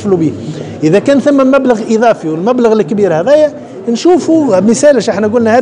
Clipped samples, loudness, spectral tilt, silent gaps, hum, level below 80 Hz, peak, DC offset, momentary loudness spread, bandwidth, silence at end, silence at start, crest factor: 0.4%; -9 LUFS; -6 dB/octave; none; none; -52 dBFS; 0 dBFS; under 0.1%; 7 LU; 10.5 kHz; 0 s; 0 s; 10 dB